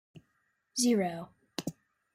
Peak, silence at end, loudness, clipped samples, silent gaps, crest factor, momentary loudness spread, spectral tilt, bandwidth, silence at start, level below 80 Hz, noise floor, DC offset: -14 dBFS; 0.45 s; -32 LUFS; under 0.1%; none; 20 dB; 15 LU; -4 dB/octave; 16 kHz; 0.15 s; -74 dBFS; -77 dBFS; under 0.1%